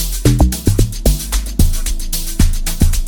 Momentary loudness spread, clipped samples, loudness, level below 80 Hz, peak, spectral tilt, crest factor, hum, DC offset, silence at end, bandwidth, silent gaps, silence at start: 7 LU; under 0.1%; -17 LUFS; -16 dBFS; 0 dBFS; -5 dB/octave; 12 dB; none; under 0.1%; 0 s; 19.5 kHz; none; 0 s